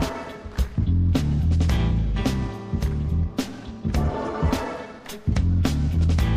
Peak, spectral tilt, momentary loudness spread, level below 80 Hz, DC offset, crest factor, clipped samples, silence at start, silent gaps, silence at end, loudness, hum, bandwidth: -8 dBFS; -7 dB/octave; 10 LU; -28 dBFS; under 0.1%; 14 dB; under 0.1%; 0 s; none; 0 s; -24 LUFS; none; 15 kHz